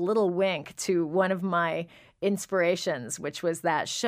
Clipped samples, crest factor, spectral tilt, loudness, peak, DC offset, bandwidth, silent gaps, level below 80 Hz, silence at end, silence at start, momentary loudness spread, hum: under 0.1%; 16 dB; -4.5 dB/octave; -28 LUFS; -10 dBFS; under 0.1%; 15.5 kHz; none; -70 dBFS; 0 s; 0 s; 7 LU; none